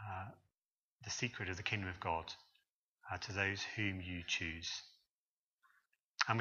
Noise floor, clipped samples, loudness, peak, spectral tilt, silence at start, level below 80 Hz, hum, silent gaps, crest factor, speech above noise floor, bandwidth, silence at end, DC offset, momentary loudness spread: under -90 dBFS; under 0.1%; -41 LUFS; -14 dBFS; -3.5 dB/octave; 0 s; -66 dBFS; none; 0.58-0.99 s, 2.70-2.96 s, 5.11-5.58 s, 6.04-6.14 s; 30 dB; over 48 dB; 7.6 kHz; 0 s; under 0.1%; 16 LU